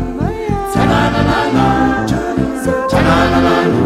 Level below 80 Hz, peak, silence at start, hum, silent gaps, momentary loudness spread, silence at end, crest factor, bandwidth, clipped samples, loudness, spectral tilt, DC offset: -28 dBFS; 0 dBFS; 0 s; none; none; 7 LU; 0 s; 12 dB; 15 kHz; under 0.1%; -13 LUFS; -6.5 dB/octave; under 0.1%